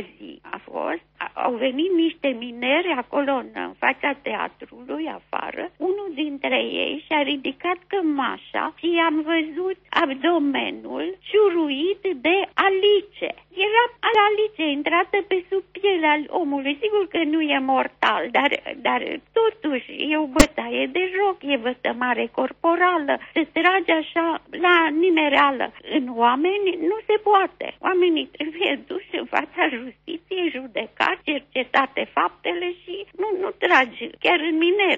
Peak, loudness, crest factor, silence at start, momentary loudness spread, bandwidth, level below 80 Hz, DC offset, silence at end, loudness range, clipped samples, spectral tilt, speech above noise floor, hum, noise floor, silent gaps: 0 dBFS; -22 LUFS; 22 dB; 0 s; 11 LU; 7.4 kHz; -46 dBFS; under 0.1%; 0 s; 5 LU; under 0.1%; -1 dB/octave; 20 dB; none; -42 dBFS; none